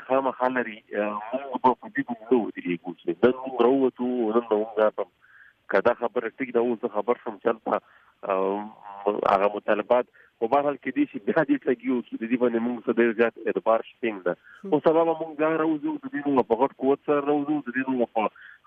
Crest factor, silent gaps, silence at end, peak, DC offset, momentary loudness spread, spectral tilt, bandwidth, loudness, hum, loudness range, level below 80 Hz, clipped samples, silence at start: 18 dB; none; 0.2 s; -8 dBFS; under 0.1%; 8 LU; -8.5 dB/octave; 5.6 kHz; -25 LUFS; none; 2 LU; -70 dBFS; under 0.1%; 0 s